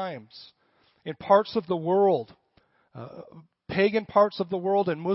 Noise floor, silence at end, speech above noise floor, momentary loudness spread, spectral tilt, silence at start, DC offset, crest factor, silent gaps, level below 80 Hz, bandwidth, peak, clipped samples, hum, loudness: -66 dBFS; 0 s; 41 dB; 21 LU; -10 dB/octave; 0 s; under 0.1%; 20 dB; none; -66 dBFS; 5.8 kHz; -6 dBFS; under 0.1%; none; -24 LUFS